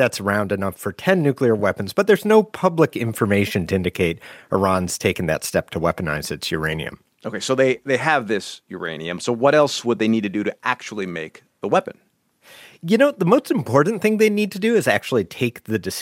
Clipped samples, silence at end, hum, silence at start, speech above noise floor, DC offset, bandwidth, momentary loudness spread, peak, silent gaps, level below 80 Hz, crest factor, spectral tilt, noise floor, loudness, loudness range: under 0.1%; 0 s; none; 0 s; 31 dB; under 0.1%; 16.5 kHz; 11 LU; 0 dBFS; none; -52 dBFS; 20 dB; -5.5 dB/octave; -51 dBFS; -20 LUFS; 4 LU